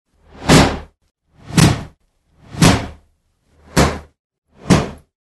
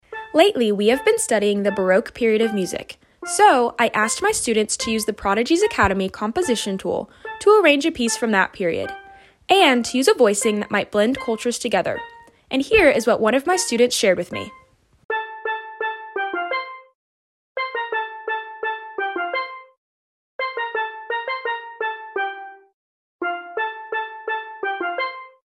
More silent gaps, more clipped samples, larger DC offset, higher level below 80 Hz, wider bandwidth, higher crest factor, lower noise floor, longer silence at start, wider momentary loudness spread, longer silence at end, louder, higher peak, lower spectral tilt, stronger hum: second, 4.19-4.30 s, 4.38-4.42 s vs 15.05-15.09 s, 16.95-17.55 s, 19.78-20.39 s, 22.73-23.19 s; neither; neither; first, -30 dBFS vs -50 dBFS; second, 12.5 kHz vs 15 kHz; about the same, 18 dB vs 20 dB; first, -60 dBFS vs -43 dBFS; first, 0.4 s vs 0.1 s; first, 19 LU vs 12 LU; about the same, 0.3 s vs 0.2 s; first, -15 LUFS vs -20 LUFS; about the same, 0 dBFS vs -2 dBFS; first, -5 dB/octave vs -3 dB/octave; neither